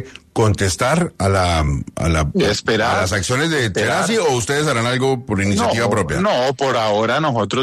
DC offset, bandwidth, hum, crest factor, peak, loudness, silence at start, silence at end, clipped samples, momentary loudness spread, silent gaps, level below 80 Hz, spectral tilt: under 0.1%; 13.5 kHz; none; 14 dB; -2 dBFS; -17 LUFS; 0 s; 0 s; under 0.1%; 2 LU; none; -34 dBFS; -4.5 dB/octave